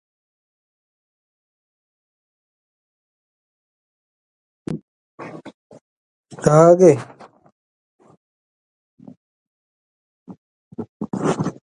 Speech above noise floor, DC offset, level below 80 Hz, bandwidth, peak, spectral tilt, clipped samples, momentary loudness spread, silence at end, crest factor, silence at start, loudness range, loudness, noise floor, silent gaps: over 76 dB; under 0.1%; -58 dBFS; 11 kHz; 0 dBFS; -7.5 dB/octave; under 0.1%; 28 LU; 0.25 s; 24 dB; 4.7 s; 21 LU; -15 LUFS; under -90 dBFS; 4.82-5.18 s, 5.54-5.70 s, 5.81-6.23 s, 7.52-7.99 s, 8.17-8.98 s, 9.17-10.26 s, 10.38-10.71 s, 10.89-11.00 s